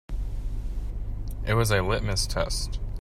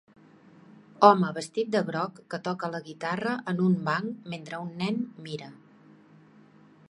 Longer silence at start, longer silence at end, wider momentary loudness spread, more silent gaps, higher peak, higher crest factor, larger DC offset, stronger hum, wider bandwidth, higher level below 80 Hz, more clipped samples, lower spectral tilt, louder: second, 0.1 s vs 1 s; second, 0 s vs 1.35 s; second, 12 LU vs 18 LU; neither; second, -10 dBFS vs -2 dBFS; second, 18 dB vs 28 dB; neither; neither; first, 15 kHz vs 11.5 kHz; first, -30 dBFS vs -74 dBFS; neither; second, -4.5 dB/octave vs -6.5 dB/octave; about the same, -29 LUFS vs -28 LUFS